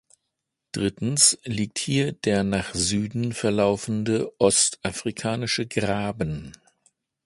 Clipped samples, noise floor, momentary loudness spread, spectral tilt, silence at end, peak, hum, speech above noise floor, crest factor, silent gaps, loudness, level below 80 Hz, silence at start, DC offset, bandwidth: under 0.1%; -81 dBFS; 11 LU; -3.5 dB/octave; 0.75 s; -2 dBFS; none; 57 dB; 22 dB; none; -23 LUFS; -50 dBFS; 0.75 s; under 0.1%; 11.5 kHz